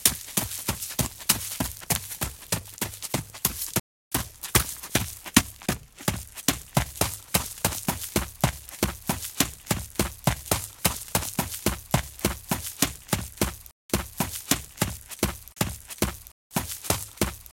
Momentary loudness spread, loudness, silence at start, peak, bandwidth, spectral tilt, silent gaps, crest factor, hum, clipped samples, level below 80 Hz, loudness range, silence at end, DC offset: 6 LU; -28 LUFS; 0 s; 0 dBFS; 17 kHz; -3 dB/octave; 3.80-4.11 s, 13.72-13.89 s, 16.32-16.50 s; 28 dB; none; under 0.1%; -42 dBFS; 3 LU; 0.05 s; under 0.1%